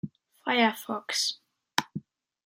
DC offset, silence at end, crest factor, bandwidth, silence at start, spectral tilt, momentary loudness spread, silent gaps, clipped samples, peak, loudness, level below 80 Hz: under 0.1%; 0.45 s; 26 dB; 16.5 kHz; 0.05 s; -2.5 dB/octave; 18 LU; none; under 0.1%; -4 dBFS; -28 LUFS; -76 dBFS